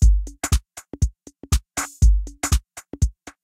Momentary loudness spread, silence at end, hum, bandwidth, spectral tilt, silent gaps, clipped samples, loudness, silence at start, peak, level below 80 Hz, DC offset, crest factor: 7 LU; 0.35 s; none; 15.5 kHz; -4 dB/octave; none; under 0.1%; -24 LUFS; 0 s; -4 dBFS; -22 dBFS; under 0.1%; 16 dB